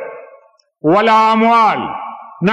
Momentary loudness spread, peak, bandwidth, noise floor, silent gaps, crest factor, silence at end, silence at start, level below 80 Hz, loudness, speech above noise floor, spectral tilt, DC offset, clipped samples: 17 LU; -4 dBFS; 11.5 kHz; -48 dBFS; none; 10 dB; 0 s; 0 s; -60 dBFS; -12 LUFS; 36 dB; -6.5 dB/octave; under 0.1%; under 0.1%